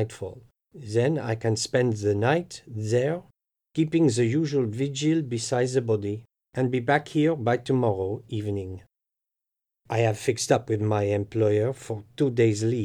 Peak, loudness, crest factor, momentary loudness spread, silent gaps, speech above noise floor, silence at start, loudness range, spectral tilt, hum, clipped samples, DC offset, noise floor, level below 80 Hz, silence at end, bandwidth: -8 dBFS; -25 LUFS; 18 dB; 12 LU; none; 63 dB; 0 s; 3 LU; -6 dB/octave; none; under 0.1%; under 0.1%; -87 dBFS; -66 dBFS; 0 s; 12.5 kHz